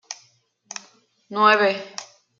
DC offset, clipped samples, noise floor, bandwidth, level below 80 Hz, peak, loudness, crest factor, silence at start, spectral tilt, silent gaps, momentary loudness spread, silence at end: under 0.1%; under 0.1%; -61 dBFS; 7.8 kHz; -82 dBFS; -2 dBFS; -19 LUFS; 22 dB; 0.1 s; -2.5 dB/octave; none; 22 LU; 0.35 s